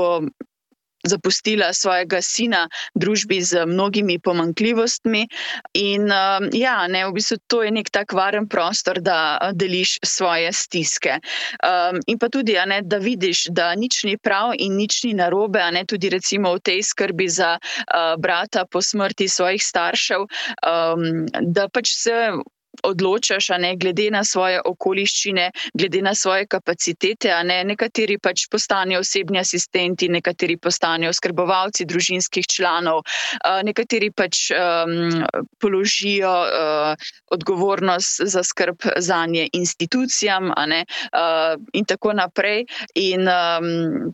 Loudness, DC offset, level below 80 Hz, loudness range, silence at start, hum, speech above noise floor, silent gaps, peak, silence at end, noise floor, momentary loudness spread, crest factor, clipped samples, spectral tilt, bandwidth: -19 LUFS; under 0.1%; -68 dBFS; 1 LU; 0 s; none; 50 dB; none; -6 dBFS; 0 s; -70 dBFS; 4 LU; 14 dB; under 0.1%; -2.5 dB/octave; 8.8 kHz